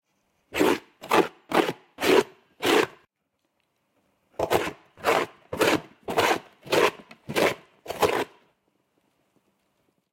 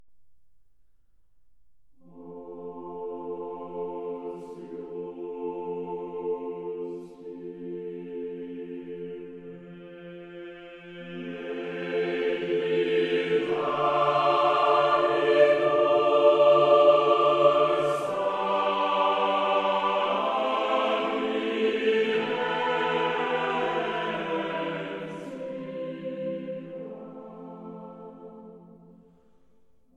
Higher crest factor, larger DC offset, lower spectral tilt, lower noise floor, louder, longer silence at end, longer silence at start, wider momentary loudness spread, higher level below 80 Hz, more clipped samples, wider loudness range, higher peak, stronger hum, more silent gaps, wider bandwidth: about the same, 20 dB vs 20 dB; neither; second, -3.5 dB/octave vs -5.5 dB/octave; first, -77 dBFS vs -67 dBFS; about the same, -25 LUFS vs -25 LUFS; first, 1.85 s vs 1.35 s; first, 0.55 s vs 0 s; second, 12 LU vs 22 LU; first, -62 dBFS vs -72 dBFS; neither; second, 3 LU vs 19 LU; about the same, -6 dBFS vs -8 dBFS; neither; neither; first, 16.5 kHz vs 9.4 kHz